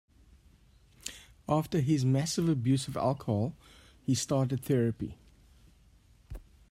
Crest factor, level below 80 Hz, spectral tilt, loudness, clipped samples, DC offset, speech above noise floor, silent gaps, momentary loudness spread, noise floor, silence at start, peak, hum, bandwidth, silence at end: 18 dB; -56 dBFS; -6 dB/octave; -30 LUFS; under 0.1%; under 0.1%; 32 dB; none; 17 LU; -61 dBFS; 1.05 s; -14 dBFS; none; 15.5 kHz; 0.3 s